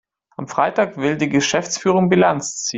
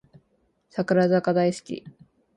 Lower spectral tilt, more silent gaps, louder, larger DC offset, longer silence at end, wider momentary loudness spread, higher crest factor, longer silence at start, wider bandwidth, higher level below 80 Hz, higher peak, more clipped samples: second, -4.5 dB/octave vs -7 dB/octave; neither; first, -18 LUFS vs -23 LUFS; neither; second, 0 s vs 0.45 s; second, 10 LU vs 16 LU; about the same, 16 dB vs 16 dB; second, 0.4 s vs 0.75 s; second, 8.2 kHz vs 11 kHz; first, -56 dBFS vs -68 dBFS; first, -2 dBFS vs -10 dBFS; neither